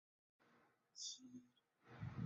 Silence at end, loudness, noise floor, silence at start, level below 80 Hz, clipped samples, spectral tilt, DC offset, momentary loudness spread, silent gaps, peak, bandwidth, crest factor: 0 s; -54 LUFS; -77 dBFS; 0.4 s; -74 dBFS; under 0.1%; -4.5 dB/octave; under 0.1%; 13 LU; none; -36 dBFS; 7.6 kHz; 20 dB